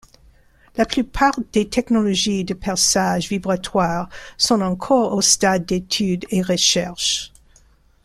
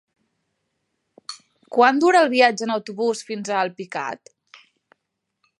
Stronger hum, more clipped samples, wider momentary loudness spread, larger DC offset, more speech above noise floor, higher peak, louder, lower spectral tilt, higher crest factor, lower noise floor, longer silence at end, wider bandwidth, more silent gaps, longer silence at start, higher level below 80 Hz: neither; neither; second, 8 LU vs 22 LU; neither; second, 34 dB vs 59 dB; about the same, -2 dBFS vs -2 dBFS; about the same, -19 LUFS vs -20 LUFS; about the same, -3 dB/octave vs -3.5 dB/octave; about the same, 18 dB vs 20 dB; second, -54 dBFS vs -78 dBFS; second, 0.75 s vs 1.45 s; first, 14.5 kHz vs 11.5 kHz; neither; second, 0.75 s vs 1.3 s; first, -44 dBFS vs -82 dBFS